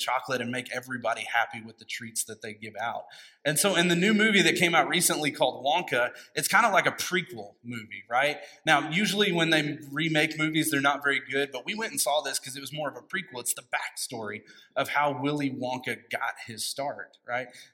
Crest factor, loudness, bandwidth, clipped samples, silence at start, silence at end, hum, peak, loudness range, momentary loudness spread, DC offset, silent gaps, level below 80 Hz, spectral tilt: 22 dB; -27 LUFS; 16.5 kHz; under 0.1%; 0 s; 0.1 s; none; -6 dBFS; 7 LU; 14 LU; under 0.1%; none; -78 dBFS; -3 dB/octave